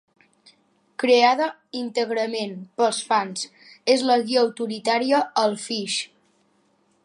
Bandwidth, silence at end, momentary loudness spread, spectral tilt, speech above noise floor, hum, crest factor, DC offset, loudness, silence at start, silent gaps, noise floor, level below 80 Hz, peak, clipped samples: 11.5 kHz; 1 s; 13 LU; -3 dB/octave; 43 dB; none; 20 dB; under 0.1%; -22 LUFS; 1 s; none; -64 dBFS; -80 dBFS; -4 dBFS; under 0.1%